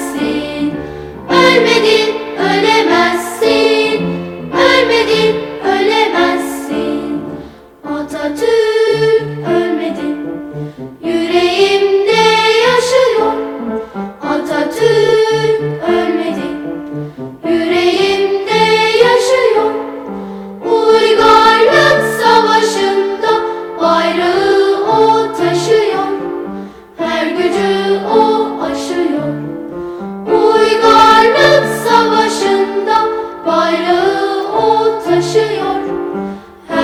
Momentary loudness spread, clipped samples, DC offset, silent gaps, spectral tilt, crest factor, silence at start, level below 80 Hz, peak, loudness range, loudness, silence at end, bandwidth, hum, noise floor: 14 LU; 0.2%; under 0.1%; none; -4 dB/octave; 12 dB; 0 s; -46 dBFS; 0 dBFS; 5 LU; -12 LUFS; 0 s; 15.5 kHz; none; -32 dBFS